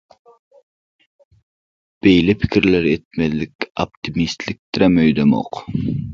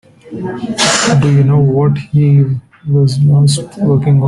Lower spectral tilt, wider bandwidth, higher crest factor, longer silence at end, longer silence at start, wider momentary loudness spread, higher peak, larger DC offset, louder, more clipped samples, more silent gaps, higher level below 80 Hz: first, -7 dB/octave vs -5.5 dB/octave; second, 7.4 kHz vs 11.5 kHz; first, 18 dB vs 10 dB; about the same, 0 s vs 0 s; first, 2.05 s vs 0.25 s; about the same, 11 LU vs 12 LU; about the same, 0 dBFS vs 0 dBFS; neither; second, -18 LUFS vs -11 LUFS; neither; first, 3.05-3.11 s, 3.55-3.59 s, 3.70-3.75 s, 3.97-4.02 s, 4.59-4.73 s vs none; about the same, -42 dBFS vs -44 dBFS